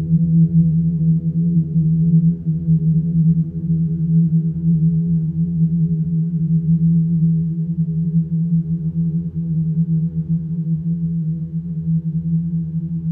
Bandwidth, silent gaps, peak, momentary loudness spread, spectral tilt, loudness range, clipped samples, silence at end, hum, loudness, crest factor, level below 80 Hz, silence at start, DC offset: 0.7 kHz; none; -6 dBFS; 6 LU; -15 dB/octave; 4 LU; under 0.1%; 0 s; none; -18 LUFS; 12 dB; -42 dBFS; 0 s; under 0.1%